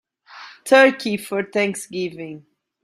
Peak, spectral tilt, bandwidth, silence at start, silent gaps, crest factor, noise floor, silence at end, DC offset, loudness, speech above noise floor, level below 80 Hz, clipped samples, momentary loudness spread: -2 dBFS; -4 dB/octave; 15.5 kHz; 0.35 s; none; 20 dB; -43 dBFS; 0.45 s; under 0.1%; -19 LUFS; 24 dB; -68 dBFS; under 0.1%; 22 LU